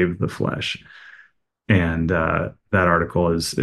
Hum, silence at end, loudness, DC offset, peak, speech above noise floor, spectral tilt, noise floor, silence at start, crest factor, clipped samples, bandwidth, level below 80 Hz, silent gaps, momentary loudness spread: none; 0 s; -21 LUFS; under 0.1%; -4 dBFS; 34 dB; -6 dB/octave; -55 dBFS; 0 s; 18 dB; under 0.1%; 12.5 kHz; -40 dBFS; none; 7 LU